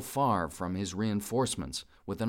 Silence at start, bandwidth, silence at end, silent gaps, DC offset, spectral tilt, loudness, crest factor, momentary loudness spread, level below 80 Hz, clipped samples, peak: 0 s; 17 kHz; 0 s; none; under 0.1%; -5 dB/octave; -32 LUFS; 14 dB; 10 LU; -56 dBFS; under 0.1%; -18 dBFS